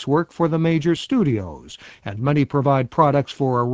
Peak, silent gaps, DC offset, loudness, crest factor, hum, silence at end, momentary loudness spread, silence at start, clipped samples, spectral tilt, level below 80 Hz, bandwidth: -2 dBFS; none; under 0.1%; -20 LUFS; 18 dB; none; 0 s; 16 LU; 0 s; under 0.1%; -8 dB/octave; -50 dBFS; 8 kHz